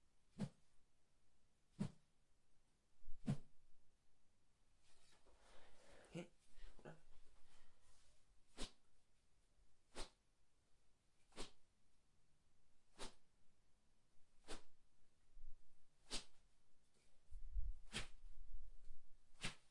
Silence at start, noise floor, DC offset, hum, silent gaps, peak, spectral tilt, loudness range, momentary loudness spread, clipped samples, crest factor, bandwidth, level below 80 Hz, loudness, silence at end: 0 s; -74 dBFS; under 0.1%; none; none; -32 dBFS; -4.5 dB/octave; 9 LU; 17 LU; under 0.1%; 20 dB; 11 kHz; -60 dBFS; -55 LUFS; 0 s